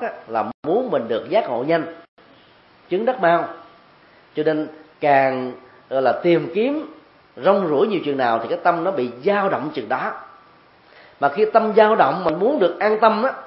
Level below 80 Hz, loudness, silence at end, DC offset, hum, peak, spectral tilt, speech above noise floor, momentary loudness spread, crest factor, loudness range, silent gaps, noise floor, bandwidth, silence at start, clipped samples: -68 dBFS; -19 LUFS; 0 s; under 0.1%; none; 0 dBFS; -10.5 dB/octave; 32 dB; 10 LU; 20 dB; 4 LU; 0.54-0.63 s, 2.08-2.17 s; -51 dBFS; 5.8 kHz; 0 s; under 0.1%